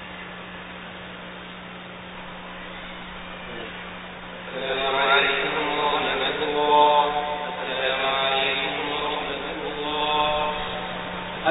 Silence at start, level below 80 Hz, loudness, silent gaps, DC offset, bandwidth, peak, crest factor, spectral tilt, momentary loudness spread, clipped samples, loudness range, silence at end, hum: 0 s; -50 dBFS; -23 LUFS; none; under 0.1%; 4 kHz; -6 dBFS; 20 dB; -8 dB/octave; 18 LU; under 0.1%; 15 LU; 0 s; none